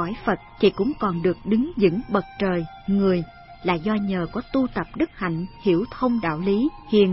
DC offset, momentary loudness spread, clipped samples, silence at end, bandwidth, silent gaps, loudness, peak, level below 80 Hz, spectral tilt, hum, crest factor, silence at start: under 0.1%; 6 LU; under 0.1%; 0 s; 5.8 kHz; none; -23 LUFS; -4 dBFS; -46 dBFS; -11.5 dB/octave; none; 18 dB; 0 s